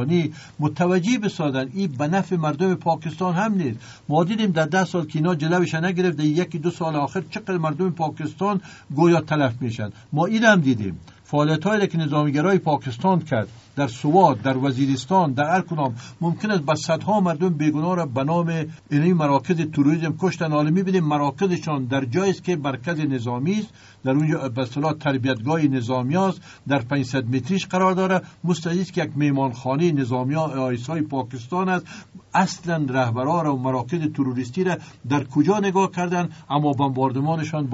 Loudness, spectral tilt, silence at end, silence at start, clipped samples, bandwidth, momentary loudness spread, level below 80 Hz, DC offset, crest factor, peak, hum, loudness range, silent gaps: -22 LUFS; -6 dB/octave; 0 s; 0 s; under 0.1%; 8 kHz; 7 LU; -60 dBFS; under 0.1%; 18 dB; -2 dBFS; none; 3 LU; none